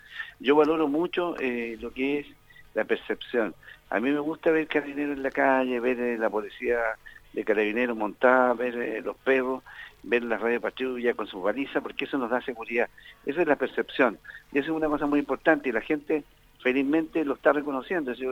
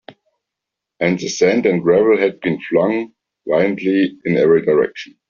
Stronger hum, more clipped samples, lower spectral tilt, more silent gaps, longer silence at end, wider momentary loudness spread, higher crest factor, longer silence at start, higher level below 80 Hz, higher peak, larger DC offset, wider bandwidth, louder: neither; neither; about the same, -6 dB/octave vs -5.5 dB/octave; neither; second, 0 s vs 0.25 s; about the same, 9 LU vs 9 LU; first, 20 dB vs 14 dB; about the same, 0.1 s vs 0.1 s; about the same, -58 dBFS vs -58 dBFS; second, -6 dBFS vs -2 dBFS; neither; first, 16 kHz vs 7.4 kHz; second, -27 LUFS vs -16 LUFS